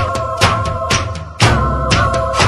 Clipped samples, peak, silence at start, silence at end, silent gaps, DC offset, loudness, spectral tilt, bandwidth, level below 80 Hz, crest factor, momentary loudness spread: under 0.1%; 0 dBFS; 0 s; 0 s; none; under 0.1%; -15 LUFS; -4 dB/octave; 12.5 kHz; -24 dBFS; 14 dB; 5 LU